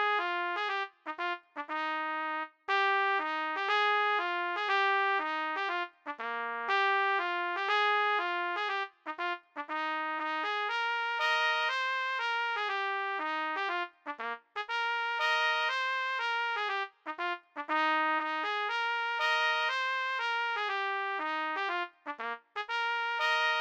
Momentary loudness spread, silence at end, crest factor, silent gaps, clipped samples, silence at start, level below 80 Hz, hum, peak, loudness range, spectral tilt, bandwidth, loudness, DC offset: 10 LU; 0 s; 16 dB; none; under 0.1%; 0 s; under -90 dBFS; none; -16 dBFS; 3 LU; 0 dB/octave; 17 kHz; -31 LUFS; under 0.1%